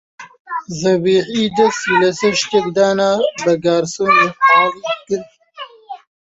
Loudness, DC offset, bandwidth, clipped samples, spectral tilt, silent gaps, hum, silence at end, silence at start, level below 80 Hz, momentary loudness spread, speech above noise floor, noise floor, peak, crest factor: -15 LUFS; under 0.1%; 8 kHz; under 0.1%; -4 dB/octave; 0.40-0.45 s; none; 0.35 s; 0.2 s; -56 dBFS; 21 LU; 21 dB; -36 dBFS; -2 dBFS; 14 dB